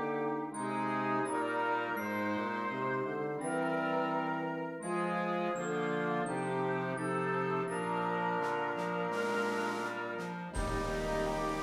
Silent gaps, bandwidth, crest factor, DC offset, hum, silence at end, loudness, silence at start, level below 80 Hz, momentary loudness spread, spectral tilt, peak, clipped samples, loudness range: none; 15.5 kHz; 14 dB; under 0.1%; none; 0 s; -35 LUFS; 0 s; -52 dBFS; 4 LU; -5.5 dB/octave; -22 dBFS; under 0.1%; 1 LU